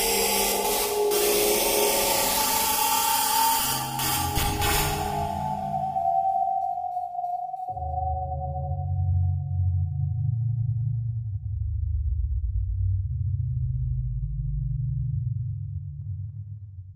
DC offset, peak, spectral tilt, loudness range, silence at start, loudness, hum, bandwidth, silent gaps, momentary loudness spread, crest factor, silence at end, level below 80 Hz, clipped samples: under 0.1%; -10 dBFS; -3.5 dB/octave; 8 LU; 0 s; -25 LUFS; none; 16 kHz; none; 11 LU; 16 dB; 0 s; -36 dBFS; under 0.1%